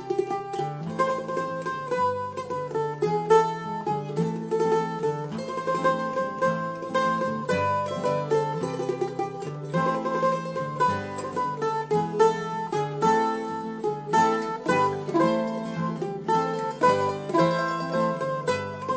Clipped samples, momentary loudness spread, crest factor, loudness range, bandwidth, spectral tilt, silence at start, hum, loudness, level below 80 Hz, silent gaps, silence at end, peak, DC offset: under 0.1%; 8 LU; 18 dB; 2 LU; 8 kHz; -6 dB/octave; 0 s; none; -26 LUFS; -60 dBFS; none; 0 s; -8 dBFS; under 0.1%